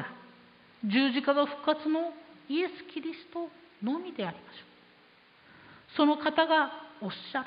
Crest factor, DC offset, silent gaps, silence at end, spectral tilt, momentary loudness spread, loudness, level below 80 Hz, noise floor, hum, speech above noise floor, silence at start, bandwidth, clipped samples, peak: 20 dB; under 0.1%; none; 0 s; -8.5 dB/octave; 17 LU; -30 LUFS; -80 dBFS; -60 dBFS; none; 30 dB; 0 s; 5.2 kHz; under 0.1%; -12 dBFS